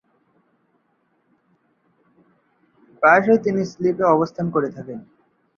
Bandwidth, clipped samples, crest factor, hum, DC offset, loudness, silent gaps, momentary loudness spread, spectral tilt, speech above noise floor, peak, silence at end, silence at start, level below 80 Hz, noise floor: 7.2 kHz; under 0.1%; 20 dB; none; under 0.1%; -18 LUFS; none; 19 LU; -7.5 dB/octave; 48 dB; -2 dBFS; 0.55 s; 3 s; -66 dBFS; -66 dBFS